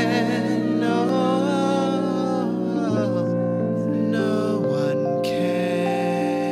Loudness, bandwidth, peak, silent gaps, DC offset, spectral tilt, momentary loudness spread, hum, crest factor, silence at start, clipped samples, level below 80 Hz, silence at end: -22 LUFS; 13.5 kHz; -8 dBFS; none; under 0.1%; -7 dB/octave; 2 LU; none; 12 dB; 0 s; under 0.1%; -66 dBFS; 0 s